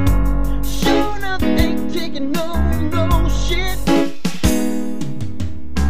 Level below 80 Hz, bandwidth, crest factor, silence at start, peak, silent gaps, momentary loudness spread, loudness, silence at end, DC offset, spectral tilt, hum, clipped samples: -22 dBFS; 15.5 kHz; 18 dB; 0 s; 0 dBFS; none; 8 LU; -20 LUFS; 0 s; 10%; -5.5 dB/octave; none; under 0.1%